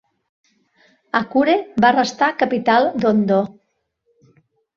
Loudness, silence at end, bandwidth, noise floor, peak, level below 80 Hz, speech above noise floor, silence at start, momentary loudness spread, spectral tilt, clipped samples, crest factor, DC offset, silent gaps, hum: -17 LUFS; 1.25 s; 7.6 kHz; -70 dBFS; -2 dBFS; -60 dBFS; 53 dB; 1.15 s; 6 LU; -5.5 dB/octave; under 0.1%; 18 dB; under 0.1%; none; none